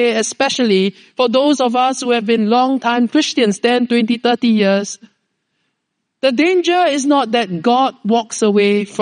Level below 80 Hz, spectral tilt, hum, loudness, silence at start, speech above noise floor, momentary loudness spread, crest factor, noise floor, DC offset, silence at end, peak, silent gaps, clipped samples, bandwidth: -70 dBFS; -4 dB/octave; none; -15 LUFS; 0 s; 59 dB; 4 LU; 14 dB; -73 dBFS; under 0.1%; 0 s; -2 dBFS; none; under 0.1%; 10 kHz